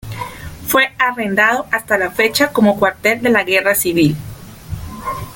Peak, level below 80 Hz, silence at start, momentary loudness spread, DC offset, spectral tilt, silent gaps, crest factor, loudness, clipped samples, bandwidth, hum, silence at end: 0 dBFS; -42 dBFS; 0.05 s; 16 LU; under 0.1%; -4 dB/octave; none; 16 dB; -14 LUFS; under 0.1%; 17 kHz; none; 0 s